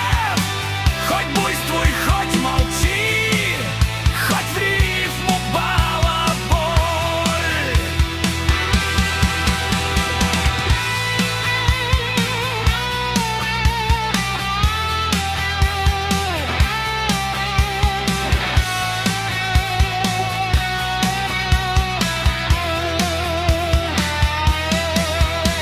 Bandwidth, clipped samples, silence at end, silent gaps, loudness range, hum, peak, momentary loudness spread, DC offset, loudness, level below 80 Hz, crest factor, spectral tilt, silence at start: 16 kHz; under 0.1%; 0 s; none; 1 LU; none; -2 dBFS; 2 LU; under 0.1%; -18 LUFS; -24 dBFS; 16 dB; -4 dB/octave; 0 s